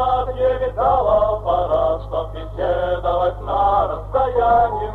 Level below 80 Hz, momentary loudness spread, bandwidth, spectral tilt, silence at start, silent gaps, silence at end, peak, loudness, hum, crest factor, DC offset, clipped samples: -32 dBFS; 7 LU; 4.5 kHz; -8 dB/octave; 0 s; none; 0 s; -6 dBFS; -19 LUFS; none; 12 dB; under 0.1%; under 0.1%